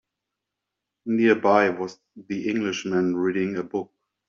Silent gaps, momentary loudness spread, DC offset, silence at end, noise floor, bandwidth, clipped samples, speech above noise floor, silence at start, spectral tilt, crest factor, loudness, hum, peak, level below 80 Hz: none; 14 LU; under 0.1%; 0.45 s; -84 dBFS; 7.4 kHz; under 0.1%; 61 dB; 1.05 s; -4.5 dB/octave; 20 dB; -24 LUFS; none; -4 dBFS; -70 dBFS